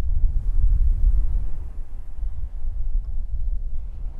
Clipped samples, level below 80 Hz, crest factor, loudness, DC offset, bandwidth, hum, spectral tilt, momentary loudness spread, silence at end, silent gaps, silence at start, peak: under 0.1%; -22 dBFS; 14 dB; -29 LUFS; under 0.1%; 1.1 kHz; none; -9.5 dB/octave; 12 LU; 0 s; none; 0 s; -6 dBFS